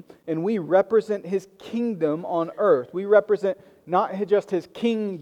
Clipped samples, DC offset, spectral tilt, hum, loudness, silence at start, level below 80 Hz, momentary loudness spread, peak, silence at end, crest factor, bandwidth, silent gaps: under 0.1%; under 0.1%; -7.5 dB/octave; none; -24 LUFS; 0.25 s; -72 dBFS; 10 LU; -4 dBFS; 0 s; 18 dB; 9.4 kHz; none